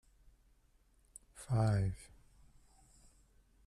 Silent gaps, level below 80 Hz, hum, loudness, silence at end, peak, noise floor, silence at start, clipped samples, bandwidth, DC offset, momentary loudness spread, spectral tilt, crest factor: none; -58 dBFS; none; -35 LUFS; 1.65 s; -22 dBFS; -70 dBFS; 1.35 s; under 0.1%; 12 kHz; under 0.1%; 26 LU; -7 dB/octave; 18 dB